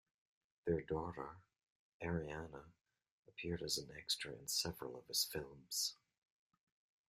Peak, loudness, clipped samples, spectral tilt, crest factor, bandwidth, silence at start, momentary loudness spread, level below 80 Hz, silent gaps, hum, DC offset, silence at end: -24 dBFS; -43 LUFS; under 0.1%; -3 dB/octave; 22 dB; 15.5 kHz; 0.65 s; 12 LU; -68 dBFS; 1.70-2.00 s, 3.11-3.23 s; none; under 0.1%; 1.15 s